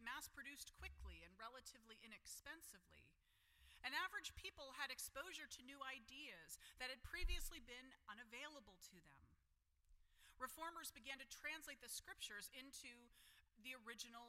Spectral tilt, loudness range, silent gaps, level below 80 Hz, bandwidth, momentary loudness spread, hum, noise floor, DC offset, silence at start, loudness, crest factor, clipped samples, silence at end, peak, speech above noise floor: -1.5 dB/octave; 7 LU; none; -62 dBFS; 16 kHz; 12 LU; none; -82 dBFS; under 0.1%; 0 s; -54 LUFS; 22 dB; under 0.1%; 0 s; -32 dBFS; 27 dB